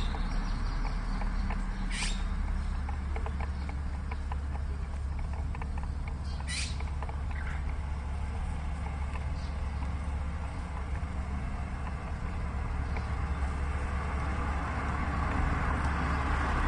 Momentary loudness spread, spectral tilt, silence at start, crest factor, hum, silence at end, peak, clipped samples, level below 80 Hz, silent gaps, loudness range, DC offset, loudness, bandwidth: 6 LU; -5.5 dB/octave; 0 s; 14 dB; none; 0 s; -18 dBFS; under 0.1%; -34 dBFS; none; 4 LU; under 0.1%; -35 LUFS; 10 kHz